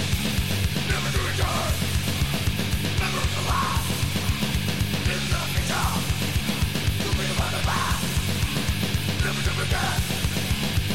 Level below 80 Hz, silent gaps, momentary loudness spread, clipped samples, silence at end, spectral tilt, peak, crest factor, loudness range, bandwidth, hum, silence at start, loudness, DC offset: -32 dBFS; none; 1 LU; under 0.1%; 0 s; -4 dB/octave; -12 dBFS; 10 dB; 0 LU; 16.5 kHz; none; 0 s; -25 LUFS; 2%